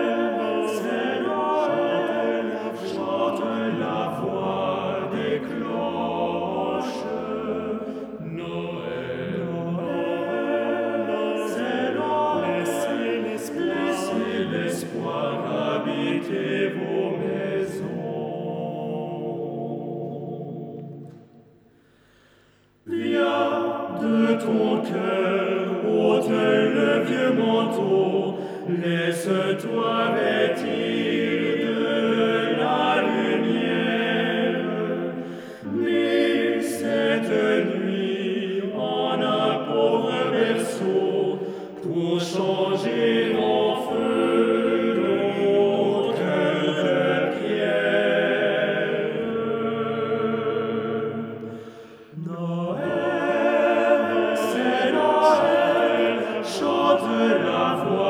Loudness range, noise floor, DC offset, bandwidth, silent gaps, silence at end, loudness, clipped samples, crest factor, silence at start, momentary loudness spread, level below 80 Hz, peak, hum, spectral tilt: 7 LU; -58 dBFS; under 0.1%; 16 kHz; none; 0 s; -23 LUFS; under 0.1%; 18 dB; 0 s; 10 LU; -70 dBFS; -6 dBFS; none; -6 dB/octave